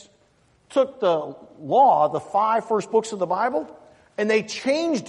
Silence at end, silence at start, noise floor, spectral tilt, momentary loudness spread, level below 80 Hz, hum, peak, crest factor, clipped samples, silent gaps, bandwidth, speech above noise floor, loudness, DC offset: 0 s; 0.7 s; -61 dBFS; -4.5 dB/octave; 12 LU; -70 dBFS; none; -6 dBFS; 16 dB; under 0.1%; none; 11 kHz; 39 dB; -22 LUFS; under 0.1%